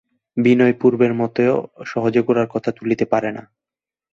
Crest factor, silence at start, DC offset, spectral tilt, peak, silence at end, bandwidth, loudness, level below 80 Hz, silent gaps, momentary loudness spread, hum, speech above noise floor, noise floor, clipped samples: 16 dB; 0.35 s; under 0.1%; -8 dB/octave; -2 dBFS; 0.75 s; 7.2 kHz; -18 LUFS; -60 dBFS; none; 12 LU; none; 72 dB; -89 dBFS; under 0.1%